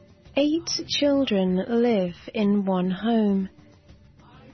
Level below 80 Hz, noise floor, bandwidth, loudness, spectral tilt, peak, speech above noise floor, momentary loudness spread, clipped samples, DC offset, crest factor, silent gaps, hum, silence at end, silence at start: -56 dBFS; -52 dBFS; 6.4 kHz; -24 LUFS; -5.5 dB/octave; -8 dBFS; 29 dB; 5 LU; under 0.1%; under 0.1%; 16 dB; none; none; 1.05 s; 0.35 s